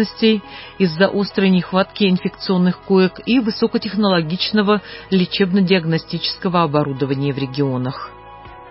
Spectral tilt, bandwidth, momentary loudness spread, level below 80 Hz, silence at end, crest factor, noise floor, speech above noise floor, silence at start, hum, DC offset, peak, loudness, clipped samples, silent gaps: -10.5 dB/octave; 5.8 kHz; 6 LU; -50 dBFS; 0 s; 16 dB; -38 dBFS; 21 dB; 0 s; none; under 0.1%; -2 dBFS; -18 LUFS; under 0.1%; none